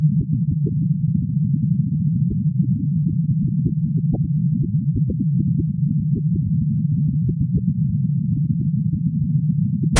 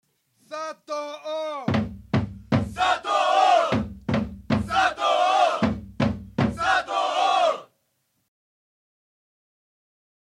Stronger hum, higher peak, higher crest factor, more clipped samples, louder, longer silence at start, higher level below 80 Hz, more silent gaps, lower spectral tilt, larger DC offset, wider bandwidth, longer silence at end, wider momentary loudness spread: neither; first, -2 dBFS vs -8 dBFS; about the same, 16 dB vs 16 dB; neither; first, -20 LUFS vs -23 LUFS; second, 0 s vs 0.5 s; first, -40 dBFS vs -46 dBFS; neither; first, -8 dB/octave vs -5.5 dB/octave; neither; second, 2 kHz vs 12 kHz; second, 0 s vs 2.6 s; second, 1 LU vs 12 LU